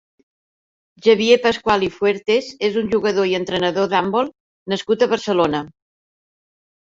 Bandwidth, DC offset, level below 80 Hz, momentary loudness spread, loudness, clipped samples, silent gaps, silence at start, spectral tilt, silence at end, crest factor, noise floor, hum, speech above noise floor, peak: 7.8 kHz; under 0.1%; -54 dBFS; 10 LU; -18 LUFS; under 0.1%; 4.40-4.66 s; 1.05 s; -5 dB/octave; 1.15 s; 18 dB; under -90 dBFS; none; over 72 dB; -2 dBFS